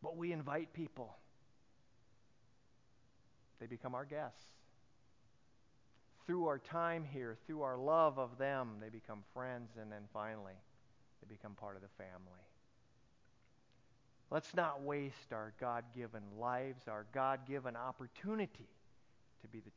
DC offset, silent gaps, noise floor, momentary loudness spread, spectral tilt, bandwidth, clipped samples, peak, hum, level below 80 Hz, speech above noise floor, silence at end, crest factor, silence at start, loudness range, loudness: under 0.1%; none; -75 dBFS; 16 LU; -5.5 dB/octave; 7.2 kHz; under 0.1%; -20 dBFS; none; -80 dBFS; 32 dB; 0.05 s; 24 dB; 0 s; 15 LU; -43 LUFS